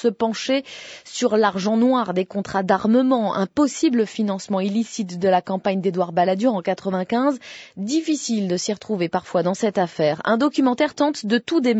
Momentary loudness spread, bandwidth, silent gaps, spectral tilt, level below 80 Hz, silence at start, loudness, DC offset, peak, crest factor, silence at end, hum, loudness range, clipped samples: 6 LU; 8.6 kHz; none; -5 dB/octave; -64 dBFS; 0 s; -21 LUFS; under 0.1%; -4 dBFS; 16 dB; 0 s; none; 3 LU; under 0.1%